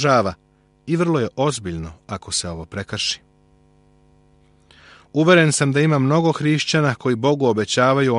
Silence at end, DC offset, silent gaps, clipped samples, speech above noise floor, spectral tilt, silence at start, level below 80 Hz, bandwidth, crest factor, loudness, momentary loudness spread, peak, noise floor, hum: 0 s; under 0.1%; none; under 0.1%; 37 dB; -5 dB/octave; 0 s; -50 dBFS; 11.5 kHz; 18 dB; -19 LUFS; 15 LU; -2 dBFS; -55 dBFS; none